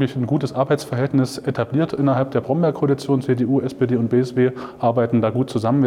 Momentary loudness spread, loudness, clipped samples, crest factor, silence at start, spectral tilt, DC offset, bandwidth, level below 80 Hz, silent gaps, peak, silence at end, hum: 3 LU; -20 LUFS; under 0.1%; 12 dB; 0 s; -8 dB/octave; under 0.1%; 13.5 kHz; -58 dBFS; none; -6 dBFS; 0 s; none